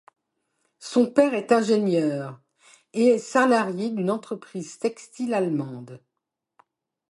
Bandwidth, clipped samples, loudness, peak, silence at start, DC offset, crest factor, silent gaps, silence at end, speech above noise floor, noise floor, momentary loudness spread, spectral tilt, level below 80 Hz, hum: 11.5 kHz; under 0.1%; -23 LUFS; -6 dBFS; 0.8 s; under 0.1%; 20 dB; none; 1.15 s; 60 dB; -83 dBFS; 16 LU; -6 dB/octave; -76 dBFS; none